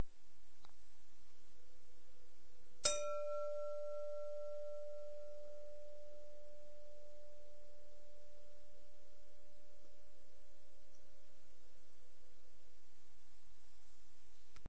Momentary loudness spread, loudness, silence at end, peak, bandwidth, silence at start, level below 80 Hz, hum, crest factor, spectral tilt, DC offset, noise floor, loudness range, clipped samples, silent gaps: 26 LU; -45 LUFS; 0 s; -20 dBFS; 8 kHz; 0 s; -74 dBFS; none; 28 dB; -2 dB/octave; 1%; -73 dBFS; 23 LU; under 0.1%; none